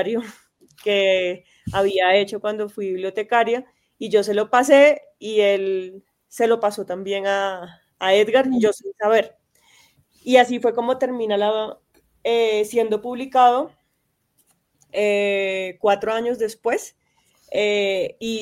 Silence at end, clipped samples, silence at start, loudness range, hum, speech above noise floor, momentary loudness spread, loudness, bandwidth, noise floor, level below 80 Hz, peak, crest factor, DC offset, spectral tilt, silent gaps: 0 s; under 0.1%; 0 s; 4 LU; none; 51 dB; 12 LU; -20 LUFS; 16 kHz; -71 dBFS; -62 dBFS; -2 dBFS; 20 dB; under 0.1%; -4 dB/octave; none